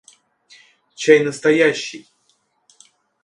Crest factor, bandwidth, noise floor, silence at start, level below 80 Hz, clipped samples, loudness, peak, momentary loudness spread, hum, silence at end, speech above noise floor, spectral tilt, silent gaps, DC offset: 20 dB; 11 kHz; -64 dBFS; 1 s; -70 dBFS; under 0.1%; -16 LUFS; 0 dBFS; 16 LU; none; 1.25 s; 49 dB; -4 dB/octave; none; under 0.1%